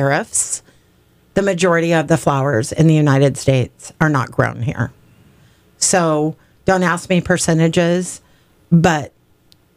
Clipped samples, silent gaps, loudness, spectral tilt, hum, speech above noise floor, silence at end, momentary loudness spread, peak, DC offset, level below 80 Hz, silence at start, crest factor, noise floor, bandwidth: under 0.1%; none; -16 LUFS; -5 dB/octave; none; 38 dB; 0.7 s; 10 LU; -2 dBFS; under 0.1%; -46 dBFS; 0 s; 14 dB; -54 dBFS; 15.5 kHz